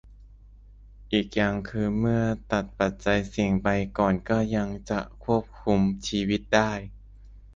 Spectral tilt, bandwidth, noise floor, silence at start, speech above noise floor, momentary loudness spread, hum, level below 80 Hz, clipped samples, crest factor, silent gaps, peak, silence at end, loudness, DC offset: -6 dB/octave; 7.6 kHz; -49 dBFS; 0.05 s; 24 dB; 6 LU; none; -44 dBFS; under 0.1%; 20 dB; none; -6 dBFS; 0.05 s; -26 LUFS; under 0.1%